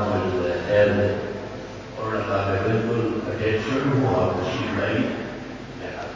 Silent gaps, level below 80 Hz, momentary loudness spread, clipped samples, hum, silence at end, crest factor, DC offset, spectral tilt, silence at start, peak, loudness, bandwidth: none; -44 dBFS; 14 LU; under 0.1%; none; 0 s; 18 dB; under 0.1%; -7 dB/octave; 0 s; -6 dBFS; -24 LUFS; 7.6 kHz